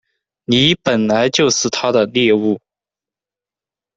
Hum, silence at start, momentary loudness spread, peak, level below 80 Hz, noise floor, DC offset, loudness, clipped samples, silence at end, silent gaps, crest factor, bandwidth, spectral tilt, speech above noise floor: none; 0.5 s; 6 LU; -2 dBFS; -52 dBFS; -89 dBFS; under 0.1%; -15 LUFS; under 0.1%; 1.4 s; none; 16 dB; 8.2 kHz; -3.5 dB/octave; 75 dB